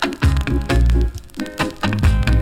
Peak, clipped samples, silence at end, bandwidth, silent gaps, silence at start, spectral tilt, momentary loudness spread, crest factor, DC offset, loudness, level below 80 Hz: -2 dBFS; under 0.1%; 0 s; 14 kHz; none; 0 s; -6 dB/octave; 8 LU; 14 dB; under 0.1%; -19 LUFS; -20 dBFS